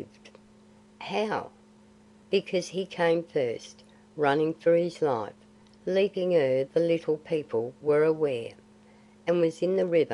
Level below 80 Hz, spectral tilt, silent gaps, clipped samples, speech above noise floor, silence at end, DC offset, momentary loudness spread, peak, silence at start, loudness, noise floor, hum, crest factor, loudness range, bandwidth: -72 dBFS; -6 dB/octave; none; under 0.1%; 30 dB; 0 s; under 0.1%; 15 LU; -10 dBFS; 0 s; -27 LUFS; -56 dBFS; none; 18 dB; 4 LU; 10.5 kHz